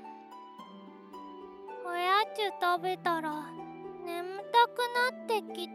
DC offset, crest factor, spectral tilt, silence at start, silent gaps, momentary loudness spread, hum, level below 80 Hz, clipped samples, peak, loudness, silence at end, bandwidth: under 0.1%; 20 dB; -3.5 dB/octave; 0 s; none; 22 LU; none; -82 dBFS; under 0.1%; -14 dBFS; -31 LUFS; 0 s; 15 kHz